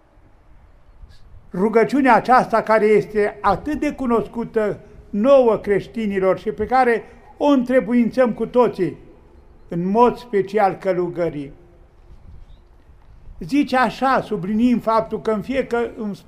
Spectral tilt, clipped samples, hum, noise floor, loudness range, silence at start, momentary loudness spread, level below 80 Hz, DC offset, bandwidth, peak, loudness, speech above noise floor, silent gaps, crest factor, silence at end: -7 dB/octave; under 0.1%; none; -50 dBFS; 6 LU; 1 s; 10 LU; -46 dBFS; under 0.1%; 13.5 kHz; -2 dBFS; -19 LUFS; 32 dB; none; 18 dB; 0.1 s